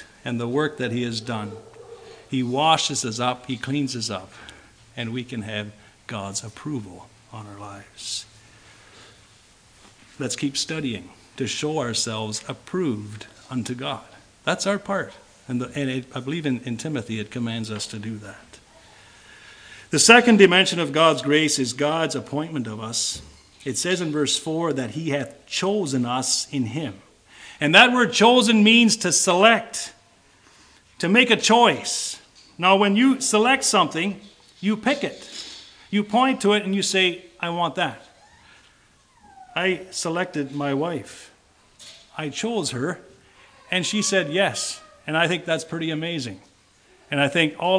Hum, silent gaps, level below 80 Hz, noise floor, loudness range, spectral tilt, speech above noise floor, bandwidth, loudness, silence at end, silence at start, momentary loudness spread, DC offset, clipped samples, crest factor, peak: none; none; -62 dBFS; -57 dBFS; 14 LU; -3.5 dB/octave; 35 dB; 10.5 kHz; -21 LUFS; 0 s; 0 s; 19 LU; under 0.1%; under 0.1%; 24 dB; 0 dBFS